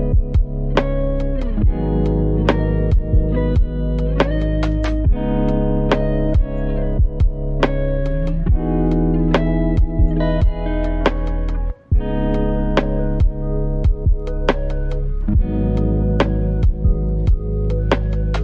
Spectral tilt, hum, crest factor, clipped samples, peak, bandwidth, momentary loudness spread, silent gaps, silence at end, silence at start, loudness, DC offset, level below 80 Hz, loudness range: -9 dB/octave; none; 16 dB; under 0.1%; 0 dBFS; 6.4 kHz; 4 LU; none; 0 s; 0 s; -19 LUFS; under 0.1%; -18 dBFS; 2 LU